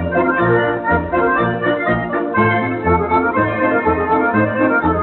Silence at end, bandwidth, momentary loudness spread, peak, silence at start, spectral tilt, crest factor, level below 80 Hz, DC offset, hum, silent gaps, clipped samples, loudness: 0 s; 4.2 kHz; 3 LU; -2 dBFS; 0 s; -5.5 dB/octave; 12 dB; -40 dBFS; under 0.1%; none; none; under 0.1%; -16 LUFS